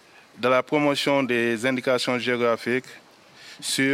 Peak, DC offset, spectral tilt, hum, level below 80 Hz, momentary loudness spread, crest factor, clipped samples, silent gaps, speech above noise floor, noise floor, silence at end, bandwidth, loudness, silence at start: -6 dBFS; under 0.1%; -4 dB/octave; none; -72 dBFS; 6 LU; 18 dB; under 0.1%; none; 25 dB; -48 dBFS; 0 s; 16 kHz; -23 LUFS; 0.35 s